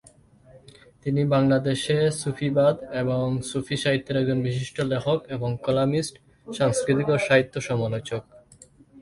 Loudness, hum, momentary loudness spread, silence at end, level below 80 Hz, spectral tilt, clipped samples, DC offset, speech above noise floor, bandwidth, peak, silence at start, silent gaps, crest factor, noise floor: -24 LUFS; none; 8 LU; 0 s; -56 dBFS; -6 dB/octave; under 0.1%; under 0.1%; 30 dB; 11.5 kHz; -4 dBFS; 0.55 s; none; 20 dB; -53 dBFS